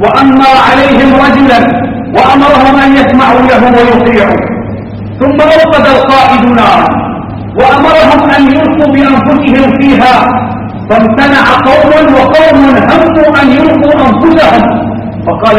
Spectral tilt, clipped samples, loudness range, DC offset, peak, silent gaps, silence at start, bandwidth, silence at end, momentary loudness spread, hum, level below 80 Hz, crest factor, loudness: -6.5 dB/octave; 7%; 2 LU; under 0.1%; 0 dBFS; none; 0 s; 10.5 kHz; 0 s; 9 LU; none; -28 dBFS; 4 dB; -5 LUFS